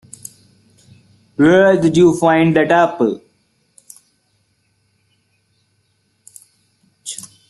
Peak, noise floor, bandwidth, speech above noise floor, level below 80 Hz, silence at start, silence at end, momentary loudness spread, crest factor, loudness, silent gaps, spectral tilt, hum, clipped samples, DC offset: -2 dBFS; -63 dBFS; 12.5 kHz; 51 dB; -56 dBFS; 1.4 s; 0.3 s; 23 LU; 16 dB; -13 LUFS; none; -6 dB/octave; none; under 0.1%; under 0.1%